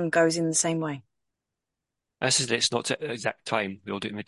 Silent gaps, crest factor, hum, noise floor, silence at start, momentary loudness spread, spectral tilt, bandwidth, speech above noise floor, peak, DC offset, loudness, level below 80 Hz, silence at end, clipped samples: none; 20 dB; none; -86 dBFS; 0 s; 10 LU; -3 dB/octave; 11.5 kHz; 59 dB; -8 dBFS; under 0.1%; -26 LUFS; -68 dBFS; 0.05 s; under 0.1%